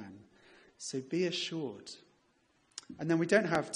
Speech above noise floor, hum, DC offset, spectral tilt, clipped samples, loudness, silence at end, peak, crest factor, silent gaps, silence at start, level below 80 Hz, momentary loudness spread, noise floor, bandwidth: 39 dB; none; under 0.1%; -4.5 dB/octave; under 0.1%; -33 LUFS; 0 s; -14 dBFS; 22 dB; none; 0 s; -76 dBFS; 21 LU; -72 dBFS; 11.5 kHz